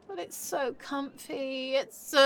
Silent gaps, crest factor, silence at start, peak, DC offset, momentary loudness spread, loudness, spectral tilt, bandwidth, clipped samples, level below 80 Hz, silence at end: none; 20 dB; 0.1 s; -10 dBFS; under 0.1%; 7 LU; -33 LUFS; -1.5 dB/octave; 17.5 kHz; under 0.1%; -74 dBFS; 0 s